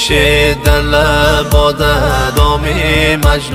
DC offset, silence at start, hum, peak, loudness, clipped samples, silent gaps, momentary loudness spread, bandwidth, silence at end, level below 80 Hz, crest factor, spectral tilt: under 0.1%; 0 s; none; 0 dBFS; -11 LUFS; 0.3%; none; 3 LU; 16.5 kHz; 0 s; -16 dBFS; 10 dB; -4.5 dB/octave